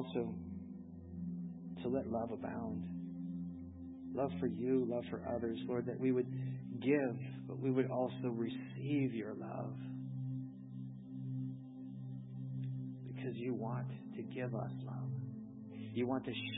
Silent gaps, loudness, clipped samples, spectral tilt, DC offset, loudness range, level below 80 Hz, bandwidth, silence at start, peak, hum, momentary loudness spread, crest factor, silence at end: none; -41 LUFS; under 0.1%; -7 dB/octave; under 0.1%; 7 LU; -66 dBFS; 3.9 kHz; 0 s; -20 dBFS; none; 13 LU; 20 dB; 0 s